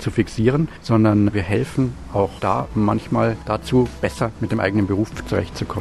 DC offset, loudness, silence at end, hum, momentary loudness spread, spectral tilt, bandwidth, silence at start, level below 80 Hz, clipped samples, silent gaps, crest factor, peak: under 0.1%; -20 LUFS; 0 s; none; 6 LU; -7.5 dB/octave; 12.5 kHz; 0 s; -38 dBFS; under 0.1%; none; 16 dB; -2 dBFS